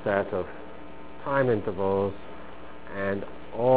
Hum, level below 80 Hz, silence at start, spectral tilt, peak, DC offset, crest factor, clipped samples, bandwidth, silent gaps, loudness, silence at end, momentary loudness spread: none; -52 dBFS; 0 s; -11 dB/octave; -8 dBFS; 1%; 20 dB; under 0.1%; 4 kHz; none; -29 LUFS; 0 s; 19 LU